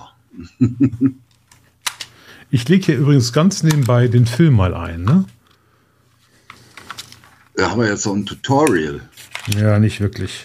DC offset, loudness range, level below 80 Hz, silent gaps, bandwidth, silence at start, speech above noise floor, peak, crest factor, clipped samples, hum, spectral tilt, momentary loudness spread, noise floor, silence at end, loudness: under 0.1%; 7 LU; -44 dBFS; none; 15.5 kHz; 0.35 s; 41 dB; -2 dBFS; 16 dB; under 0.1%; none; -6 dB/octave; 17 LU; -56 dBFS; 0 s; -16 LUFS